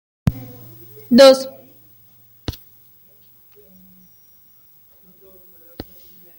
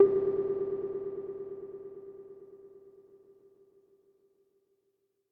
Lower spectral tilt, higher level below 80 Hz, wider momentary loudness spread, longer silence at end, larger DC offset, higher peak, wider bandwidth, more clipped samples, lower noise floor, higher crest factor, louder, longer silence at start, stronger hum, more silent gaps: second, -5 dB/octave vs -11 dB/octave; first, -46 dBFS vs -72 dBFS; first, 29 LU vs 23 LU; first, 4.9 s vs 2.4 s; neither; first, -2 dBFS vs -10 dBFS; first, 17 kHz vs 2.4 kHz; neither; second, -50 dBFS vs -78 dBFS; about the same, 20 dB vs 24 dB; first, -13 LUFS vs -34 LUFS; first, 0.25 s vs 0 s; neither; neither